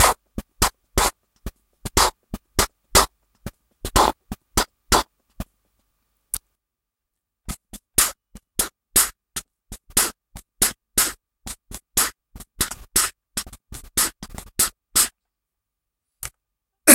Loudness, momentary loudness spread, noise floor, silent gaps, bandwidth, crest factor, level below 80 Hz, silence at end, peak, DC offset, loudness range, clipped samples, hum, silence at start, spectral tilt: -21 LUFS; 21 LU; -84 dBFS; none; 17 kHz; 24 dB; -38 dBFS; 0 s; 0 dBFS; under 0.1%; 5 LU; under 0.1%; none; 0 s; -1.5 dB/octave